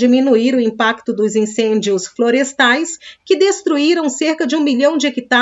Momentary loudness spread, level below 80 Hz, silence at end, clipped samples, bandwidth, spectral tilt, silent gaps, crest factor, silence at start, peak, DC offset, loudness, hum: 5 LU; -68 dBFS; 0 s; under 0.1%; 8 kHz; -3.5 dB/octave; none; 14 dB; 0 s; 0 dBFS; under 0.1%; -15 LUFS; none